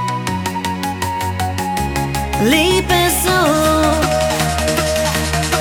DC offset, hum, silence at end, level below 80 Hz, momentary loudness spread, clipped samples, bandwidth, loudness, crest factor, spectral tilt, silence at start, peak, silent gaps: under 0.1%; none; 0 s; -28 dBFS; 7 LU; under 0.1%; over 20 kHz; -16 LUFS; 16 dB; -4 dB/octave; 0 s; 0 dBFS; none